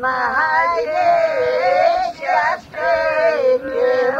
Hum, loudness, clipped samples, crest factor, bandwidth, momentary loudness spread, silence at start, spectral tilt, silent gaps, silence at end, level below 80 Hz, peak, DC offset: none; -17 LUFS; under 0.1%; 12 dB; 8 kHz; 4 LU; 0 s; -4 dB/octave; none; 0 s; -52 dBFS; -4 dBFS; under 0.1%